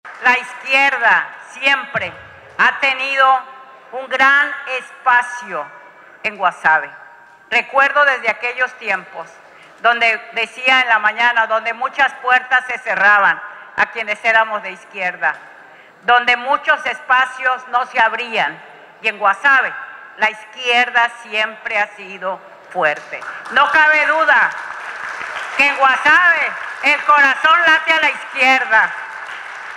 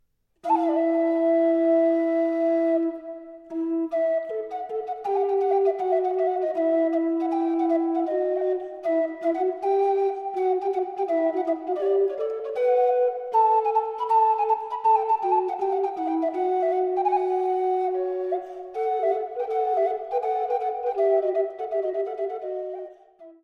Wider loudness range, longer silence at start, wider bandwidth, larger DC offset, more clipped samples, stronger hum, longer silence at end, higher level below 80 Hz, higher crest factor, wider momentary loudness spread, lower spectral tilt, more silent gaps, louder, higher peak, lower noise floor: about the same, 5 LU vs 4 LU; second, 0.05 s vs 0.45 s; first, 13 kHz vs 6 kHz; neither; neither; neither; about the same, 0 s vs 0.1 s; first, -64 dBFS vs -74 dBFS; about the same, 16 dB vs 14 dB; first, 15 LU vs 9 LU; second, -1.5 dB/octave vs -6 dB/octave; neither; first, -15 LUFS vs -24 LUFS; first, -2 dBFS vs -10 dBFS; second, -42 dBFS vs -49 dBFS